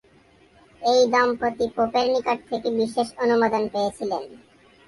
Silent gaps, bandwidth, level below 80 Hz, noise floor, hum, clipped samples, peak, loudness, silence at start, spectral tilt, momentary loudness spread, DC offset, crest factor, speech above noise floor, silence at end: none; 11.5 kHz; -60 dBFS; -56 dBFS; none; under 0.1%; -8 dBFS; -23 LUFS; 0.8 s; -4 dB/octave; 9 LU; under 0.1%; 16 dB; 33 dB; 0.5 s